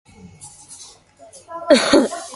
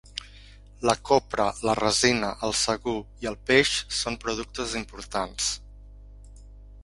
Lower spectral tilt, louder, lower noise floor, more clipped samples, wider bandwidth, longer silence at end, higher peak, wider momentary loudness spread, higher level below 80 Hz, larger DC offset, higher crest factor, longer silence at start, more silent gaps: about the same, -3 dB/octave vs -2.5 dB/octave; first, -15 LUFS vs -25 LUFS; about the same, -46 dBFS vs -48 dBFS; neither; about the same, 11.5 kHz vs 11.5 kHz; about the same, 0 s vs 0 s; first, 0 dBFS vs -4 dBFS; first, 26 LU vs 12 LU; second, -56 dBFS vs -46 dBFS; neither; about the same, 20 dB vs 22 dB; first, 0.45 s vs 0.15 s; neither